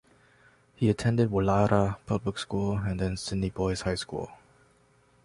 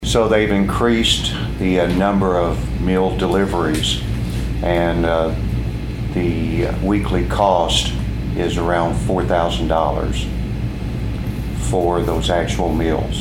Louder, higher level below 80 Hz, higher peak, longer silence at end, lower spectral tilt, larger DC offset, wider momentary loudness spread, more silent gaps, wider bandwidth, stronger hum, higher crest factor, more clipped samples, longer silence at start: second, -28 LUFS vs -18 LUFS; second, -46 dBFS vs -26 dBFS; second, -8 dBFS vs -2 dBFS; first, 0.9 s vs 0 s; about the same, -6.5 dB/octave vs -5.5 dB/octave; neither; about the same, 8 LU vs 8 LU; neither; second, 11.5 kHz vs 16 kHz; neither; about the same, 20 dB vs 16 dB; neither; first, 0.8 s vs 0 s